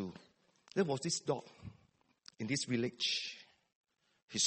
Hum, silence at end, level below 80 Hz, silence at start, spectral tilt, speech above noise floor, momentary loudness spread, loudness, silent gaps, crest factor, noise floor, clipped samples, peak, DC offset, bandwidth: none; 0 s; -74 dBFS; 0 s; -3 dB/octave; 35 dB; 20 LU; -37 LUFS; 3.75-3.84 s, 4.22-4.28 s; 22 dB; -73 dBFS; under 0.1%; -18 dBFS; under 0.1%; 8.8 kHz